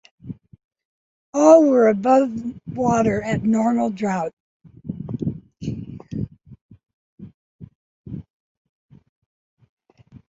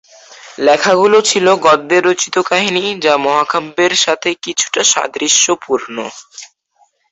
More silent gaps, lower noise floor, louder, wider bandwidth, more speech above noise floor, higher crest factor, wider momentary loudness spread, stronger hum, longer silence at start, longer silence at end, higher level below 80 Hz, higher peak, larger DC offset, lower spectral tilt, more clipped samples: first, 0.64-0.71 s, 0.85-1.33 s, 4.33-4.60 s, 6.61-6.69 s, 6.94-7.18 s, 7.34-7.59 s, 7.75-8.04 s vs none; second, -50 dBFS vs -56 dBFS; second, -19 LUFS vs -12 LUFS; about the same, 8 kHz vs 8.2 kHz; second, 33 dB vs 43 dB; first, 20 dB vs 14 dB; first, 24 LU vs 9 LU; neither; about the same, 0.25 s vs 0.3 s; first, 2.15 s vs 0.65 s; first, -52 dBFS vs -60 dBFS; about the same, -2 dBFS vs 0 dBFS; neither; first, -7 dB/octave vs -1.5 dB/octave; neither